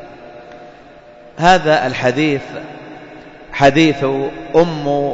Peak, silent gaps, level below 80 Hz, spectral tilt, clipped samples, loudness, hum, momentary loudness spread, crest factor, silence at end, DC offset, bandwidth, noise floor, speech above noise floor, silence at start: 0 dBFS; none; -44 dBFS; -5.5 dB/octave; under 0.1%; -14 LUFS; none; 25 LU; 16 dB; 0 s; under 0.1%; 8 kHz; -40 dBFS; 26 dB; 0 s